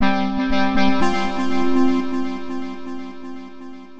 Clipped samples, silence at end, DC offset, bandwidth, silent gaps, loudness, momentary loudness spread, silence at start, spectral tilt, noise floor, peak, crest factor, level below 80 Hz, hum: under 0.1%; 0 s; under 0.1%; 8.2 kHz; none; -21 LUFS; 17 LU; 0 s; -5.5 dB/octave; -38 dBFS; -6 dBFS; 14 dB; -38 dBFS; none